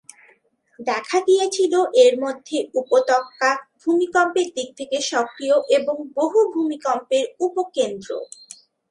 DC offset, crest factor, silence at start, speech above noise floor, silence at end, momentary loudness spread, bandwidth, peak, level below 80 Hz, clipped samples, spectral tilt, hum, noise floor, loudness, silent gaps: under 0.1%; 18 dB; 0.8 s; 39 dB; 0.65 s; 9 LU; 11.5 kHz; -2 dBFS; -74 dBFS; under 0.1%; -2.5 dB/octave; none; -59 dBFS; -20 LUFS; none